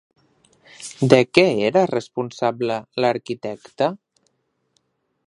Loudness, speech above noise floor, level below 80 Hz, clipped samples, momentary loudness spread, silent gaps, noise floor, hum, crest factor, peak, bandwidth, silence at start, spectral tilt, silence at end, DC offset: -20 LUFS; 50 dB; -62 dBFS; under 0.1%; 16 LU; none; -69 dBFS; none; 22 dB; 0 dBFS; 11.5 kHz; 0.8 s; -5.5 dB/octave; 1.3 s; under 0.1%